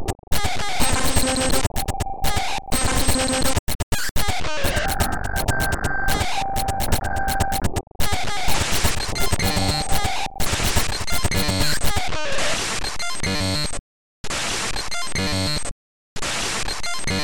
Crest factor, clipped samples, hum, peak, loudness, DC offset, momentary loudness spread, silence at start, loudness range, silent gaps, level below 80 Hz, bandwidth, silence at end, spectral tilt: 14 dB; under 0.1%; none; -6 dBFS; -23 LUFS; 4%; 6 LU; 0 s; 3 LU; 0.19-0.27 s, 3.59-3.67 s, 3.75-3.92 s, 4.11-4.15 s, 7.87-7.95 s, 13.79-14.24 s, 15.71-16.16 s; -30 dBFS; 19 kHz; 0 s; -3 dB/octave